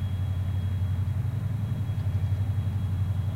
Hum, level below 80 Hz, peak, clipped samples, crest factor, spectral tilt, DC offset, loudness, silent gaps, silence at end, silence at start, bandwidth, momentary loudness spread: none; -44 dBFS; -18 dBFS; under 0.1%; 10 dB; -8.5 dB/octave; under 0.1%; -29 LUFS; none; 0 s; 0 s; 4.5 kHz; 2 LU